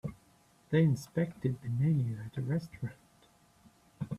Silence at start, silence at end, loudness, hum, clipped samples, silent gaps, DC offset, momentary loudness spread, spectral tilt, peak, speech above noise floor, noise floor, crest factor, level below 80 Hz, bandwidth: 0.05 s; 0 s; -33 LUFS; none; under 0.1%; none; under 0.1%; 15 LU; -8.5 dB/octave; -16 dBFS; 34 dB; -65 dBFS; 18 dB; -64 dBFS; 13 kHz